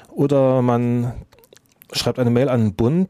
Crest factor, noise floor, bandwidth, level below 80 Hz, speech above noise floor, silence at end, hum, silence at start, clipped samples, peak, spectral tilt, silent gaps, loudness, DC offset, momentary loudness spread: 14 dB; -51 dBFS; 14.5 kHz; -46 dBFS; 34 dB; 0 s; none; 0.1 s; under 0.1%; -4 dBFS; -7 dB/octave; none; -19 LUFS; under 0.1%; 10 LU